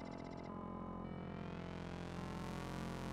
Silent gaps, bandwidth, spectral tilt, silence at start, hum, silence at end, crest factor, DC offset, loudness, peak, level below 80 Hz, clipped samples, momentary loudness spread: none; 15 kHz; -6.5 dB/octave; 0 s; none; 0 s; 14 dB; under 0.1%; -47 LUFS; -32 dBFS; -58 dBFS; under 0.1%; 3 LU